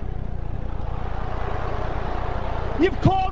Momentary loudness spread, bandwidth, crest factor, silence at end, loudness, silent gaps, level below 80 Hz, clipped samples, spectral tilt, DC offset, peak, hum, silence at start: 11 LU; 7.4 kHz; 20 dB; 0 s; -27 LUFS; none; -30 dBFS; under 0.1%; -8 dB/octave; 4%; -4 dBFS; none; 0 s